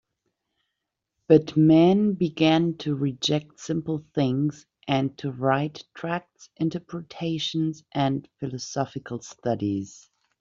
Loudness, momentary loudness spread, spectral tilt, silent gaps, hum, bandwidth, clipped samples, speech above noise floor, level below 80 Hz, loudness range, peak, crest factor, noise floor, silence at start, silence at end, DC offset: -25 LUFS; 14 LU; -6 dB/octave; none; none; 7.6 kHz; under 0.1%; 58 dB; -64 dBFS; 7 LU; -4 dBFS; 20 dB; -83 dBFS; 1.3 s; 0.5 s; under 0.1%